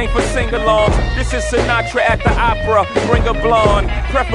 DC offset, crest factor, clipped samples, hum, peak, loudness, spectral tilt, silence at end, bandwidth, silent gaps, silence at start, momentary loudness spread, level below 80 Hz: under 0.1%; 14 dB; under 0.1%; none; 0 dBFS; -15 LUFS; -5.5 dB/octave; 0 s; 11 kHz; none; 0 s; 5 LU; -20 dBFS